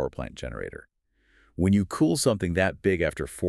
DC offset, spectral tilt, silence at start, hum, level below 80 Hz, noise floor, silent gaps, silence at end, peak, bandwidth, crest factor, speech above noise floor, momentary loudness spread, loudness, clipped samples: under 0.1%; -5.5 dB/octave; 0 s; none; -46 dBFS; -64 dBFS; none; 0 s; -8 dBFS; 13.5 kHz; 18 dB; 39 dB; 15 LU; -26 LUFS; under 0.1%